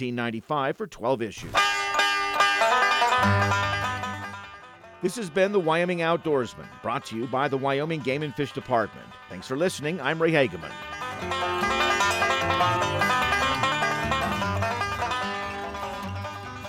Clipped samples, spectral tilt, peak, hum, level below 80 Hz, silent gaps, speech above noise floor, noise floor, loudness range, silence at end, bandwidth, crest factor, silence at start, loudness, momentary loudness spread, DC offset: under 0.1%; -4 dB/octave; -8 dBFS; none; -52 dBFS; none; 20 dB; -46 dBFS; 5 LU; 0 s; 17 kHz; 18 dB; 0 s; -25 LUFS; 12 LU; under 0.1%